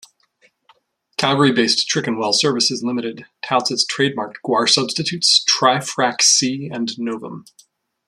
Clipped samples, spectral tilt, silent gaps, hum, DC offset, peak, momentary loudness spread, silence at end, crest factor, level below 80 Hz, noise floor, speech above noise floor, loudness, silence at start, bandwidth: under 0.1%; -2.5 dB/octave; none; none; under 0.1%; 0 dBFS; 14 LU; 0.65 s; 18 dB; -64 dBFS; -59 dBFS; 41 dB; -17 LUFS; 1.2 s; 13.5 kHz